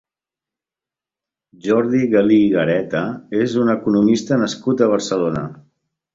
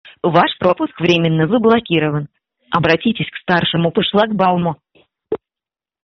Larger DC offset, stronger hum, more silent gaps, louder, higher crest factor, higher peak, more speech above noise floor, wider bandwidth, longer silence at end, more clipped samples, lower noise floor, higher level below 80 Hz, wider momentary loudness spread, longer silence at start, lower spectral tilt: neither; neither; neither; about the same, -17 LUFS vs -16 LUFS; about the same, 18 dB vs 16 dB; about the same, -2 dBFS vs -2 dBFS; about the same, 72 dB vs 74 dB; first, 7.8 kHz vs 6.4 kHz; second, 0.6 s vs 0.75 s; neither; about the same, -89 dBFS vs -89 dBFS; about the same, -56 dBFS vs -52 dBFS; second, 9 LU vs 14 LU; first, 1.65 s vs 0.05 s; first, -6.5 dB/octave vs -4 dB/octave